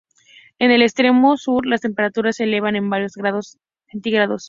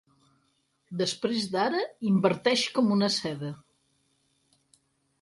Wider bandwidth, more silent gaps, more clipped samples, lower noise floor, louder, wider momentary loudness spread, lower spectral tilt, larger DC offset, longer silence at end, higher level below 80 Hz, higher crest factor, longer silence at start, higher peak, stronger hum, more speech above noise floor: second, 7.6 kHz vs 11.5 kHz; neither; neither; second, -50 dBFS vs -72 dBFS; first, -18 LUFS vs -27 LUFS; about the same, 11 LU vs 13 LU; about the same, -5 dB/octave vs -5 dB/octave; neither; second, 0 s vs 1.65 s; first, -60 dBFS vs -72 dBFS; about the same, 18 dB vs 22 dB; second, 0.6 s vs 0.9 s; first, 0 dBFS vs -8 dBFS; neither; second, 32 dB vs 45 dB